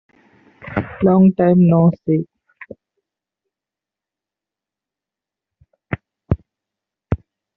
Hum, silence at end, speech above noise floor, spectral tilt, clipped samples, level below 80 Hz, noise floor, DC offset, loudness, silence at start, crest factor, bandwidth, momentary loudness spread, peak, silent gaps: none; 0.4 s; 75 dB; -10.5 dB/octave; under 0.1%; -44 dBFS; -88 dBFS; under 0.1%; -16 LUFS; 0.65 s; 18 dB; 3.8 kHz; 17 LU; -2 dBFS; none